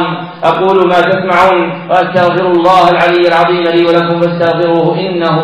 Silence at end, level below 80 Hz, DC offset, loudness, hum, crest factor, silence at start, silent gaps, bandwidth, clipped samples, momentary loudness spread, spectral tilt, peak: 0 s; -48 dBFS; 0.4%; -9 LUFS; none; 10 dB; 0 s; none; 9.4 kHz; under 0.1%; 5 LU; -7 dB/octave; 0 dBFS